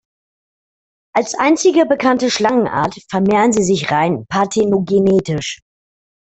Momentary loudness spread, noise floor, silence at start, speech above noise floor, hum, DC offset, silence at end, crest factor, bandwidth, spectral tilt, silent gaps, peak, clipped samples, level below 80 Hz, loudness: 7 LU; under -90 dBFS; 1.15 s; over 75 dB; none; under 0.1%; 0.7 s; 14 dB; 8.4 kHz; -5 dB/octave; none; -2 dBFS; under 0.1%; -52 dBFS; -15 LUFS